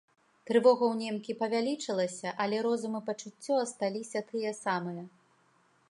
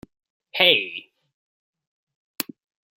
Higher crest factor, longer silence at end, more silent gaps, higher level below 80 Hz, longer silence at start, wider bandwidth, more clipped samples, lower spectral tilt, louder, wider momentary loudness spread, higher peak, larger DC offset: second, 20 dB vs 26 dB; first, 0.8 s vs 0.55 s; second, none vs 1.34-1.73 s, 1.87-2.07 s, 2.15-2.34 s; second, -86 dBFS vs -72 dBFS; about the same, 0.45 s vs 0.55 s; second, 11.5 kHz vs 16 kHz; neither; first, -4.5 dB/octave vs -2 dB/octave; second, -31 LUFS vs -20 LUFS; second, 12 LU vs 17 LU; second, -12 dBFS vs 0 dBFS; neither